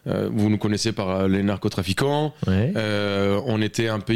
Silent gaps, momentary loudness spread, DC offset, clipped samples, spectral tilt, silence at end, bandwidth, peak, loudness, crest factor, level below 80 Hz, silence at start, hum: none; 2 LU; 0.4%; under 0.1%; -6 dB/octave; 0 s; 15.5 kHz; -8 dBFS; -23 LUFS; 14 dB; -52 dBFS; 0 s; none